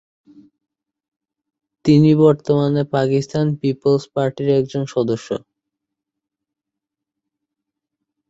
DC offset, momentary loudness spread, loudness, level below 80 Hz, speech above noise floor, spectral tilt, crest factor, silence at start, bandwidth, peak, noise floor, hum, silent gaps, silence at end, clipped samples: under 0.1%; 10 LU; -17 LUFS; -60 dBFS; 67 dB; -8 dB/octave; 18 dB; 1.85 s; 8 kHz; -2 dBFS; -83 dBFS; none; none; 2.9 s; under 0.1%